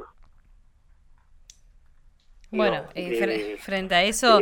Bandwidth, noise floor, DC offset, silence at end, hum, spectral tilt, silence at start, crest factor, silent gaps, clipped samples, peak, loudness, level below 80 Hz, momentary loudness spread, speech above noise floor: 19 kHz; -56 dBFS; under 0.1%; 0 s; none; -3 dB/octave; 0 s; 22 dB; none; under 0.1%; -4 dBFS; -24 LUFS; -52 dBFS; 11 LU; 33 dB